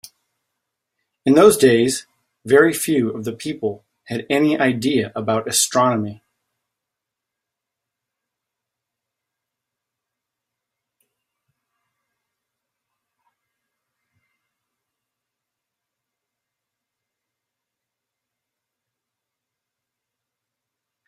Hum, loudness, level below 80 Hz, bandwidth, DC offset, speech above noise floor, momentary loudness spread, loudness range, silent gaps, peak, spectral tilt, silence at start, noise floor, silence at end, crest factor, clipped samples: none; -17 LUFS; -64 dBFS; 15.5 kHz; under 0.1%; 67 dB; 15 LU; 7 LU; none; -2 dBFS; -4 dB/octave; 1.25 s; -84 dBFS; 14.95 s; 22 dB; under 0.1%